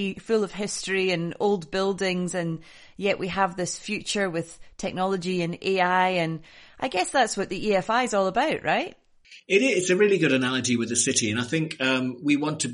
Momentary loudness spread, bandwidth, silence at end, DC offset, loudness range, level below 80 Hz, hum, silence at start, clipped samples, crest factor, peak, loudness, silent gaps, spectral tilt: 9 LU; 10.5 kHz; 0 s; under 0.1%; 5 LU; -58 dBFS; none; 0 s; under 0.1%; 18 dB; -8 dBFS; -25 LUFS; none; -4 dB/octave